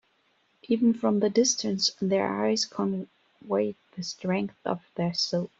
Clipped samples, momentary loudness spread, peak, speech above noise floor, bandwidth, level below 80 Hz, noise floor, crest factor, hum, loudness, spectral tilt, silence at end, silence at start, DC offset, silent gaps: under 0.1%; 10 LU; -10 dBFS; 42 dB; 7.8 kHz; -70 dBFS; -69 dBFS; 18 dB; none; -27 LUFS; -4 dB/octave; 0.15 s; 0.7 s; under 0.1%; none